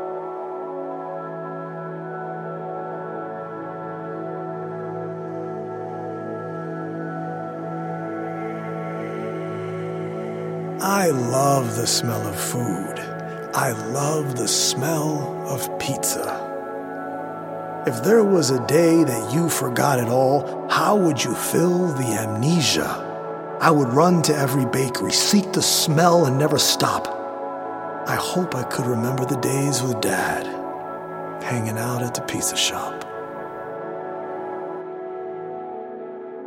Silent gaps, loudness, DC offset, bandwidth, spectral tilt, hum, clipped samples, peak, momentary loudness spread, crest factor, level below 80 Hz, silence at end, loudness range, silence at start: none; -23 LUFS; under 0.1%; 17 kHz; -4 dB/octave; none; under 0.1%; -2 dBFS; 14 LU; 22 dB; -62 dBFS; 0 s; 12 LU; 0 s